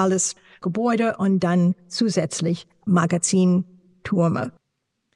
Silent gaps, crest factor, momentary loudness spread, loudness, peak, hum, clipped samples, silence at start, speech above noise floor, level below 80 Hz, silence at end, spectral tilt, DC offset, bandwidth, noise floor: none; 14 dB; 10 LU; -22 LUFS; -8 dBFS; none; under 0.1%; 0 s; 56 dB; -64 dBFS; 0.65 s; -5.5 dB/octave; under 0.1%; 11 kHz; -76 dBFS